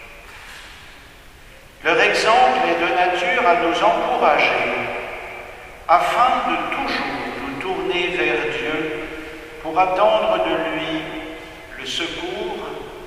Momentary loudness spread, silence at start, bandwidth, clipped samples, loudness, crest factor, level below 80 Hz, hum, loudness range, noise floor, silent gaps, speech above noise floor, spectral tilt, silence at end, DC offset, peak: 19 LU; 0 s; 15.5 kHz; under 0.1%; -19 LUFS; 20 dB; -46 dBFS; none; 5 LU; -43 dBFS; none; 25 dB; -3.5 dB/octave; 0 s; under 0.1%; 0 dBFS